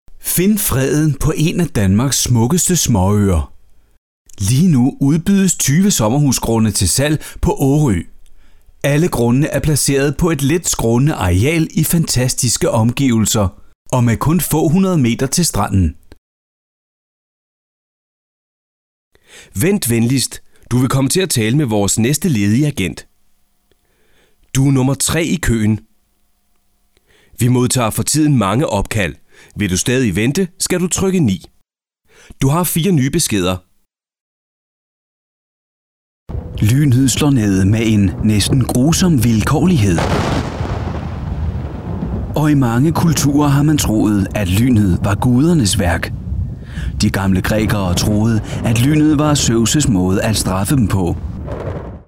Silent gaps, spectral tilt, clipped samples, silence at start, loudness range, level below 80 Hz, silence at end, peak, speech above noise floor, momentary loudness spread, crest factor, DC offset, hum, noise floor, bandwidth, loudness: 3.98-4.25 s, 13.75-13.85 s, 16.18-19.11 s, 34.21-36.26 s; -5 dB/octave; under 0.1%; 0.1 s; 5 LU; -30 dBFS; 0.1 s; -6 dBFS; 49 dB; 9 LU; 10 dB; 0.3%; none; -62 dBFS; 19.5 kHz; -15 LUFS